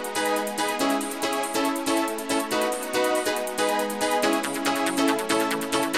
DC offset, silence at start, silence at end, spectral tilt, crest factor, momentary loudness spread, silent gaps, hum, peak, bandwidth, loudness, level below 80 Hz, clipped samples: 0.2%; 0 s; 0 s; -2 dB/octave; 16 dB; 3 LU; none; none; -10 dBFS; 16.5 kHz; -25 LUFS; -62 dBFS; under 0.1%